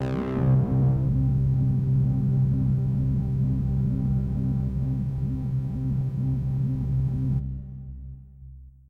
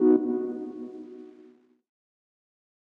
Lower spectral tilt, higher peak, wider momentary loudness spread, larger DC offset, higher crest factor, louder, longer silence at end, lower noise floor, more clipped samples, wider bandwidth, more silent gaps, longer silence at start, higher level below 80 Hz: about the same, -11 dB/octave vs -10 dB/octave; second, -14 dBFS vs -10 dBFS; second, 7 LU vs 23 LU; neither; second, 12 dB vs 20 dB; first, -25 LUFS vs -28 LUFS; second, 0.2 s vs 1.65 s; second, -45 dBFS vs -56 dBFS; neither; first, 3 kHz vs 2.6 kHz; neither; about the same, 0 s vs 0 s; first, -36 dBFS vs -78 dBFS